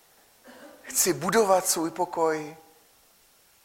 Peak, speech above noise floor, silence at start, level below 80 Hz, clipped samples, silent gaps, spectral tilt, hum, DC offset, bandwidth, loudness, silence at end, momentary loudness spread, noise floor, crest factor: -8 dBFS; 36 dB; 0.45 s; -68 dBFS; under 0.1%; none; -2.5 dB/octave; none; under 0.1%; 16.5 kHz; -25 LUFS; 1.1 s; 13 LU; -60 dBFS; 20 dB